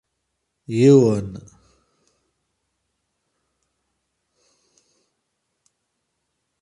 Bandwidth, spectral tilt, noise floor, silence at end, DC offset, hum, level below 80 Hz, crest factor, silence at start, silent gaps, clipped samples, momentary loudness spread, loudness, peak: 11 kHz; -8 dB/octave; -76 dBFS; 5.2 s; under 0.1%; none; -58 dBFS; 22 dB; 0.7 s; none; under 0.1%; 23 LU; -16 LUFS; -4 dBFS